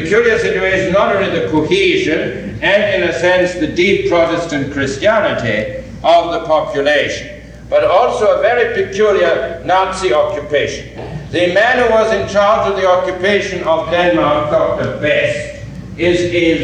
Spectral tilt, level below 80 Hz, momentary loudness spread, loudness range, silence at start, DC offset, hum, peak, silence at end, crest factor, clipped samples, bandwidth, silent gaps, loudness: -5 dB/octave; -38 dBFS; 7 LU; 2 LU; 0 s; under 0.1%; none; -2 dBFS; 0 s; 12 dB; under 0.1%; 9.8 kHz; none; -13 LUFS